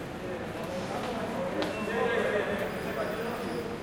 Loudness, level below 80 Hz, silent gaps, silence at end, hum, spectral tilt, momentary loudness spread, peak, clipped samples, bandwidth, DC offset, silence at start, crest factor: -32 LUFS; -56 dBFS; none; 0 s; none; -5.5 dB/octave; 8 LU; -16 dBFS; under 0.1%; 16.5 kHz; under 0.1%; 0 s; 16 dB